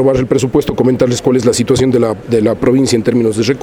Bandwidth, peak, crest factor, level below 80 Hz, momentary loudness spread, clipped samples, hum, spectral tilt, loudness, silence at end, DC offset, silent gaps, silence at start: 16.5 kHz; 0 dBFS; 12 dB; -36 dBFS; 3 LU; under 0.1%; none; -6 dB/octave; -12 LUFS; 0 s; under 0.1%; none; 0 s